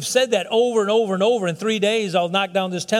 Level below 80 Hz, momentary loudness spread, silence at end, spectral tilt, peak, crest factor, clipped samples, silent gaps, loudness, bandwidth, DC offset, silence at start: -70 dBFS; 4 LU; 0 s; -4 dB/octave; -6 dBFS; 14 dB; under 0.1%; none; -20 LUFS; 15.5 kHz; under 0.1%; 0 s